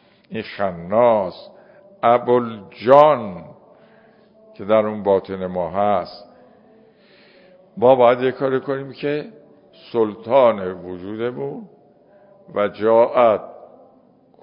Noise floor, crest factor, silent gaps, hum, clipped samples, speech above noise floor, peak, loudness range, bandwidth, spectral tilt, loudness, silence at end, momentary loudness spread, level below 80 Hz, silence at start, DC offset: -53 dBFS; 20 dB; none; none; under 0.1%; 35 dB; 0 dBFS; 5 LU; 5.4 kHz; -8.5 dB/octave; -18 LUFS; 0.9 s; 17 LU; -58 dBFS; 0.3 s; under 0.1%